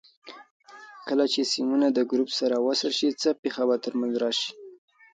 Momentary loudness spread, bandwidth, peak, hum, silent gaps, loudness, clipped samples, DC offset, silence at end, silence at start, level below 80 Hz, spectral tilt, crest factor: 17 LU; 9.2 kHz; -12 dBFS; none; 0.51-0.60 s, 3.39-3.43 s; -25 LUFS; under 0.1%; under 0.1%; 0.4 s; 0.25 s; -78 dBFS; -3 dB/octave; 16 dB